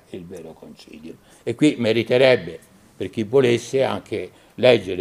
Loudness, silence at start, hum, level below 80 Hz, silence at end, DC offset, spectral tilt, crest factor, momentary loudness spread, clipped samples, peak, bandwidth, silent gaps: -19 LUFS; 0.15 s; none; -60 dBFS; 0 s; under 0.1%; -5.5 dB/octave; 18 dB; 22 LU; under 0.1%; -2 dBFS; 14.5 kHz; none